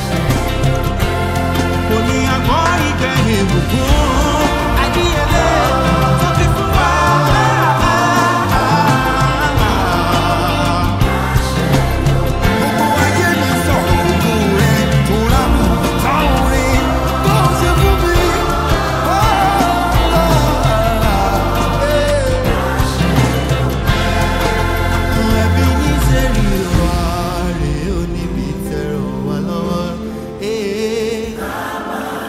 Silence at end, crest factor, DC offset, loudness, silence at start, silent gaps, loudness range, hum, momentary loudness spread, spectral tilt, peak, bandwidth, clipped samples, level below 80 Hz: 0 s; 12 dB; under 0.1%; -14 LUFS; 0 s; none; 5 LU; none; 7 LU; -5.5 dB/octave; -2 dBFS; 16 kHz; under 0.1%; -20 dBFS